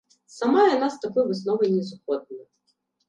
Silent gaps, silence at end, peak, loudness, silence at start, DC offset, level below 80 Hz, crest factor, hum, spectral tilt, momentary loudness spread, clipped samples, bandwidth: none; 0.65 s; -6 dBFS; -23 LUFS; 0.35 s; under 0.1%; -72 dBFS; 18 dB; none; -6 dB/octave; 12 LU; under 0.1%; 9.4 kHz